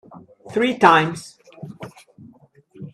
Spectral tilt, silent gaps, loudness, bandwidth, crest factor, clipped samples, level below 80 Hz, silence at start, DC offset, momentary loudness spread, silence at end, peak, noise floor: -5 dB/octave; none; -17 LUFS; 13.5 kHz; 22 dB; under 0.1%; -64 dBFS; 0.15 s; under 0.1%; 26 LU; 0.05 s; 0 dBFS; -51 dBFS